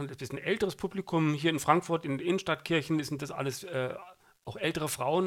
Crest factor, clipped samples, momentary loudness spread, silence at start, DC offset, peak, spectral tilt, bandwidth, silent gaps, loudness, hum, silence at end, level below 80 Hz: 22 dB; under 0.1%; 10 LU; 0 s; under 0.1%; -8 dBFS; -5 dB/octave; 17 kHz; none; -31 LUFS; none; 0 s; -66 dBFS